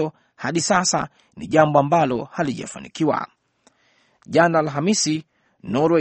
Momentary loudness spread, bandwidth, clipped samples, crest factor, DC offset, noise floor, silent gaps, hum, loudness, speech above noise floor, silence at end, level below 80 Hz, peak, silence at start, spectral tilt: 15 LU; 8.8 kHz; under 0.1%; 20 dB; under 0.1%; -61 dBFS; none; none; -20 LUFS; 41 dB; 0 s; -60 dBFS; 0 dBFS; 0 s; -4.5 dB/octave